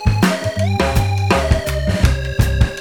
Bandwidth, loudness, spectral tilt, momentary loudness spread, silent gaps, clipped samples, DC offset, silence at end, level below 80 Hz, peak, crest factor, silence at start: 18.5 kHz; -17 LUFS; -6 dB/octave; 3 LU; none; under 0.1%; under 0.1%; 0 s; -20 dBFS; -2 dBFS; 14 dB; 0 s